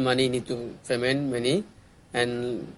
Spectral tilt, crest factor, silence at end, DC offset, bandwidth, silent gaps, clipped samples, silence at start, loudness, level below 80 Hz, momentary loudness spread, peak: -5 dB/octave; 18 dB; 0 s; under 0.1%; 11.5 kHz; none; under 0.1%; 0 s; -27 LUFS; -58 dBFS; 9 LU; -8 dBFS